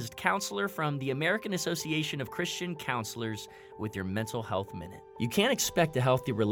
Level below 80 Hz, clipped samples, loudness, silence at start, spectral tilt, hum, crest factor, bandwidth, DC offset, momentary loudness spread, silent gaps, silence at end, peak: -64 dBFS; under 0.1%; -31 LUFS; 0 s; -4.5 dB/octave; none; 24 dB; 19 kHz; under 0.1%; 11 LU; none; 0 s; -8 dBFS